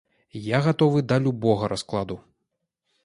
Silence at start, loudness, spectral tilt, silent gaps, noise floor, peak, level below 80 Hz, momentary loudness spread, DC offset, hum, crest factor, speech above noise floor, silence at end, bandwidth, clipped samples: 0.35 s; -23 LUFS; -7 dB/octave; none; -79 dBFS; -6 dBFS; -56 dBFS; 15 LU; under 0.1%; none; 18 dB; 57 dB; 0.85 s; 11.5 kHz; under 0.1%